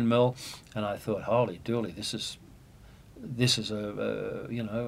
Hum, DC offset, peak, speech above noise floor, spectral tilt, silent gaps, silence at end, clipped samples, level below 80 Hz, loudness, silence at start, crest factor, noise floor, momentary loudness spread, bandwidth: none; under 0.1%; -12 dBFS; 23 dB; -5 dB/octave; none; 0 s; under 0.1%; -58 dBFS; -31 LUFS; 0 s; 20 dB; -53 dBFS; 13 LU; 16 kHz